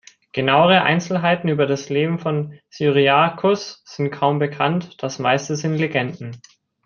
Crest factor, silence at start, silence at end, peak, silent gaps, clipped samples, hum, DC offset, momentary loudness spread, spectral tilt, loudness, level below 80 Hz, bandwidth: 18 dB; 0.35 s; 0.5 s; -2 dBFS; none; under 0.1%; none; under 0.1%; 13 LU; -5.5 dB/octave; -19 LUFS; -62 dBFS; 7.2 kHz